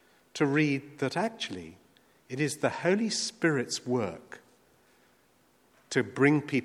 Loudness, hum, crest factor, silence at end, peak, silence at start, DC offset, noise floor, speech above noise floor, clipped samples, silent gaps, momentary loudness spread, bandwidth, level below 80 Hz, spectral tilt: -29 LUFS; none; 22 dB; 0 s; -10 dBFS; 0.35 s; under 0.1%; -66 dBFS; 37 dB; under 0.1%; none; 18 LU; 13.5 kHz; -74 dBFS; -5 dB/octave